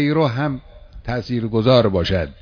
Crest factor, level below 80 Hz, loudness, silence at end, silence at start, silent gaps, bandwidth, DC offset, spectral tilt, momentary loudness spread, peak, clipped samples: 18 dB; -38 dBFS; -19 LUFS; 0.1 s; 0 s; none; 5.4 kHz; under 0.1%; -8 dB/octave; 13 LU; -2 dBFS; under 0.1%